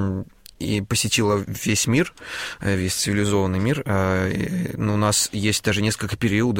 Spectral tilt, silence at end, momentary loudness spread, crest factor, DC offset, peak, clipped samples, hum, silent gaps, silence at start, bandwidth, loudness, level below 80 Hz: -4.5 dB/octave; 0 s; 8 LU; 16 dB; under 0.1%; -6 dBFS; under 0.1%; none; none; 0 s; 16.5 kHz; -22 LUFS; -46 dBFS